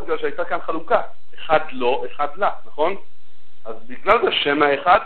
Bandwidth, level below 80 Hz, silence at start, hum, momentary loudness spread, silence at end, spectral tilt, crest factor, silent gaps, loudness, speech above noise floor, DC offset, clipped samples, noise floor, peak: 4.7 kHz; -52 dBFS; 0 s; none; 20 LU; 0 s; -6.5 dB/octave; 20 dB; none; -20 LUFS; 40 dB; 9%; under 0.1%; -60 dBFS; 0 dBFS